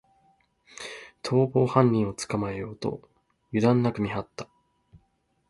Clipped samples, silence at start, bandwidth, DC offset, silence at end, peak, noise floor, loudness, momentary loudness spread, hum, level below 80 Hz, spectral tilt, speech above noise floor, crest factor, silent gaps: under 0.1%; 0.75 s; 11.5 kHz; under 0.1%; 1.05 s; -6 dBFS; -70 dBFS; -26 LUFS; 19 LU; none; -58 dBFS; -7 dB/octave; 46 dB; 22 dB; none